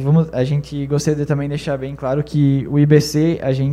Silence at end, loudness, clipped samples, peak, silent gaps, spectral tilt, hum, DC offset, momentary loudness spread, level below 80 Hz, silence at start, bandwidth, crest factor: 0 s; -18 LUFS; under 0.1%; 0 dBFS; none; -7.5 dB/octave; none; under 0.1%; 8 LU; -42 dBFS; 0 s; 13.5 kHz; 16 dB